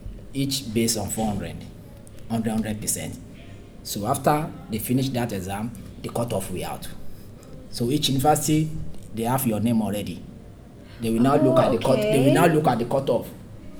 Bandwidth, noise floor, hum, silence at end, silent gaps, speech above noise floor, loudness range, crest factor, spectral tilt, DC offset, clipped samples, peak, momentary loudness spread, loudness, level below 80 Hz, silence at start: over 20 kHz; -43 dBFS; none; 0 s; none; 21 dB; 7 LU; 20 dB; -5 dB/octave; under 0.1%; under 0.1%; -4 dBFS; 24 LU; -23 LUFS; -44 dBFS; 0 s